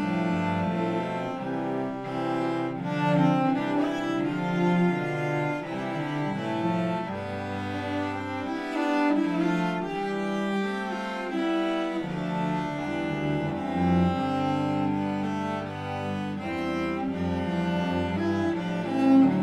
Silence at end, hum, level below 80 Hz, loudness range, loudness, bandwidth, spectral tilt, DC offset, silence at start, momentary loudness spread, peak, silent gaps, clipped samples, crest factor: 0 s; none; -56 dBFS; 3 LU; -28 LUFS; 11 kHz; -7.5 dB/octave; under 0.1%; 0 s; 8 LU; -10 dBFS; none; under 0.1%; 18 dB